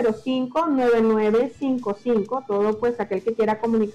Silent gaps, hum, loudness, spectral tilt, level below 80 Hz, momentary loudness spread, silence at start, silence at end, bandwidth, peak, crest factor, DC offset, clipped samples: none; none; -22 LUFS; -7 dB/octave; -56 dBFS; 7 LU; 0 s; 0.05 s; 9.2 kHz; -14 dBFS; 8 dB; under 0.1%; under 0.1%